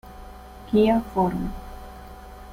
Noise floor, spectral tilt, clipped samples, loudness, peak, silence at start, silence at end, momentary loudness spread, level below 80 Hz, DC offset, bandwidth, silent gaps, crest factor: -42 dBFS; -8 dB/octave; under 0.1%; -23 LUFS; -8 dBFS; 0.05 s; 0 s; 24 LU; -40 dBFS; under 0.1%; 16 kHz; none; 18 dB